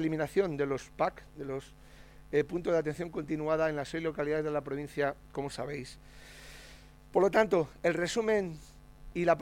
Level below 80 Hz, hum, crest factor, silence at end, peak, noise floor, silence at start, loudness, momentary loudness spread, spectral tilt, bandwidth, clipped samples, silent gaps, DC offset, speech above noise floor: -56 dBFS; none; 20 dB; 0 s; -12 dBFS; -53 dBFS; 0 s; -32 LUFS; 20 LU; -6 dB/octave; 16.5 kHz; under 0.1%; none; under 0.1%; 22 dB